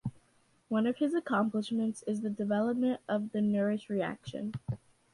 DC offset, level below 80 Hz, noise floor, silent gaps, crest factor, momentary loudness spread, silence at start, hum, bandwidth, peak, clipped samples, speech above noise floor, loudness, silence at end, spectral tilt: under 0.1%; -66 dBFS; -69 dBFS; none; 14 dB; 10 LU; 0.05 s; none; 11.5 kHz; -18 dBFS; under 0.1%; 37 dB; -33 LUFS; 0.35 s; -7 dB/octave